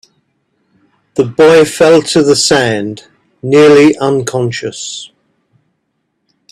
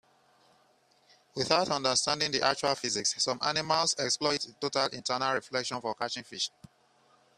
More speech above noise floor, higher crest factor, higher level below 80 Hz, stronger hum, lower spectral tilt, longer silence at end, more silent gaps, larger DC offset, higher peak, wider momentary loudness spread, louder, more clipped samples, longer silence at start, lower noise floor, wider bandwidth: first, 57 dB vs 36 dB; second, 12 dB vs 24 dB; first, -50 dBFS vs -70 dBFS; neither; first, -4.5 dB/octave vs -2 dB/octave; first, 1.45 s vs 0.9 s; neither; neither; first, 0 dBFS vs -8 dBFS; first, 17 LU vs 8 LU; first, -9 LUFS vs -29 LUFS; neither; second, 1.15 s vs 1.35 s; about the same, -66 dBFS vs -66 dBFS; about the same, 13 kHz vs 13.5 kHz